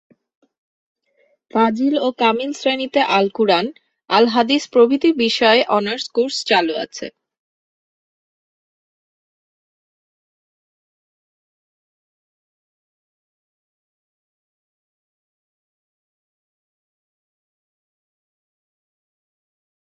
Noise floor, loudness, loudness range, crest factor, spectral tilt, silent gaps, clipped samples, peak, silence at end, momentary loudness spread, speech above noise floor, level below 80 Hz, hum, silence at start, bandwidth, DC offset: -62 dBFS; -17 LUFS; 8 LU; 22 dB; -4 dB/octave; none; under 0.1%; -2 dBFS; 12.8 s; 9 LU; 46 dB; -68 dBFS; none; 1.55 s; 8.2 kHz; under 0.1%